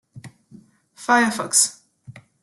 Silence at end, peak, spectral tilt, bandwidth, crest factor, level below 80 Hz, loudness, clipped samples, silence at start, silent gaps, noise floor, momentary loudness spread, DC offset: 0.25 s; -4 dBFS; -1.5 dB/octave; 12.5 kHz; 20 dB; -66 dBFS; -18 LUFS; under 0.1%; 0.15 s; none; -50 dBFS; 6 LU; under 0.1%